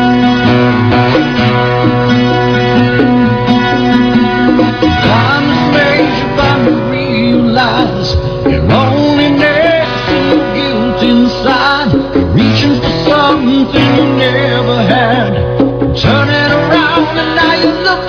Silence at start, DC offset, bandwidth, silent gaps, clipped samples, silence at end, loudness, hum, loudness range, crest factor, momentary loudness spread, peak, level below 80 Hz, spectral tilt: 0 s; under 0.1%; 5.4 kHz; none; 0.3%; 0 s; -9 LUFS; none; 1 LU; 10 dB; 3 LU; 0 dBFS; -28 dBFS; -7 dB/octave